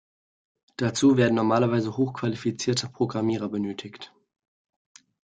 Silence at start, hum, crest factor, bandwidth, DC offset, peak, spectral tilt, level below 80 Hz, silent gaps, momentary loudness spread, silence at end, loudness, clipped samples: 0.8 s; none; 18 dB; 9.4 kHz; under 0.1%; -8 dBFS; -5.5 dB/octave; -64 dBFS; none; 18 LU; 1.2 s; -25 LUFS; under 0.1%